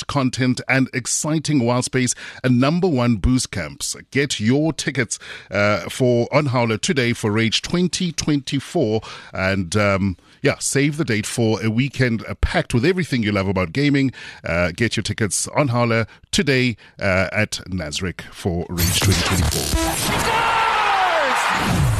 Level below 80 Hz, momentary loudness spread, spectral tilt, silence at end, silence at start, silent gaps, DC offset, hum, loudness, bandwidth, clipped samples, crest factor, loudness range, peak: -36 dBFS; 7 LU; -4.5 dB/octave; 0 s; 0 s; none; under 0.1%; none; -20 LUFS; 13 kHz; under 0.1%; 16 dB; 2 LU; -4 dBFS